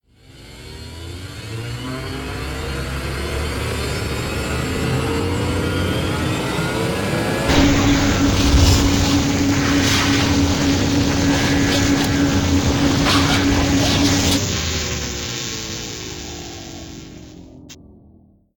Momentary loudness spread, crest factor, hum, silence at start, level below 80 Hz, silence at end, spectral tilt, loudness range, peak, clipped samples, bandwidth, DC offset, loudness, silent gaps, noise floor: 16 LU; 18 dB; none; 0.35 s; -28 dBFS; 0.7 s; -4.5 dB/octave; 11 LU; -2 dBFS; under 0.1%; 18 kHz; under 0.1%; -18 LUFS; none; -50 dBFS